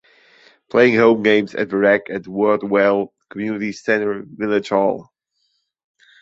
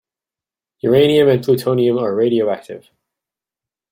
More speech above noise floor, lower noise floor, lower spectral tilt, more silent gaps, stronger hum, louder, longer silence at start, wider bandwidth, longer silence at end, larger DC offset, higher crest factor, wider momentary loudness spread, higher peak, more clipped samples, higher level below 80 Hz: second, 52 dB vs 75 dB; second, -69 dBFS vs -89 dBFS; about the same, -6.5 dB/octave vs -7 dB/octave; neither; neither; second, -18 LUFS vs -15 LUFS; about the same, 0.75 s vs 0.85 s; second, 7.8 kHz vs 16.5 kHz; about the same, 1.2 s vs 1.15 s; neither; about the same, 18 dB vs 16 dB; about the same, 12 LU vs 14 LU; about the same, -2 dBFS vs -2 dBFS; neither; about the same, -62 dBFS vs -58 dBFS